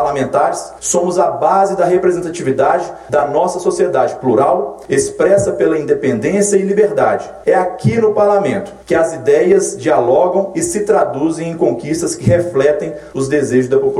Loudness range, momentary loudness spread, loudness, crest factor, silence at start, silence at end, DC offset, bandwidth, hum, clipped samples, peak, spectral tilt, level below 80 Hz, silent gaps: 1 LU; 6 LU; -14 LUFS; 14 dB; 0 s; 0 s; under 0.1%; 13.5 kHz; none; under 0.1%; 0 dBFS; -5.5 dB/octave; -46 dBFS; none